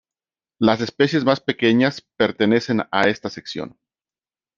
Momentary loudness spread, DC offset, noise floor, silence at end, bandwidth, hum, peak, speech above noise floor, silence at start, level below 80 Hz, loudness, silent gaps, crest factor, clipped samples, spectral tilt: 13 LU; under 0.1%; under -90 dBFS; 0.9 s; 7.4 kHz; none; -2 dBFS; over 71 dB; 0.6 s; -60 dBFS; -19 LUFS; none; 20 dB; under 0.1%; -6 dB/octave